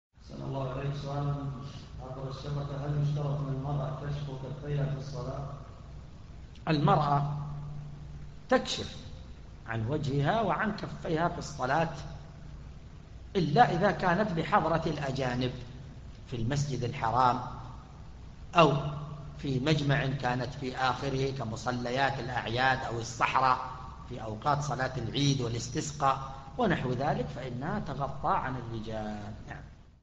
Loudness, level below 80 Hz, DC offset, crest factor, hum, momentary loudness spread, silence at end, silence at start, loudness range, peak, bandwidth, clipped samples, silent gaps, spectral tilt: -31 LUFS; -48 dBFS; under 0.1%; 24 dB; none; 20 LU; 0.1 s; 0.15 s; 5 LU; -8 dBFS; 8 kHz; under 0.1%; none; -6 dB/octave